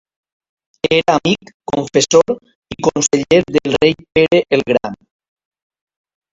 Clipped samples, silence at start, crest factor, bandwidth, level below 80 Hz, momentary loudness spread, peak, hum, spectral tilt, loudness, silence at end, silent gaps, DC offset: under 0.1%; 0.85 s; 16 dB; 8 kHz; -48 dBFS; 9 LU; 0 dBFS; none; -4 dB/octave; -15 LUFS; 1.4 s; 1.54-1.60 s, 2.55-2.62 s; under 0.1%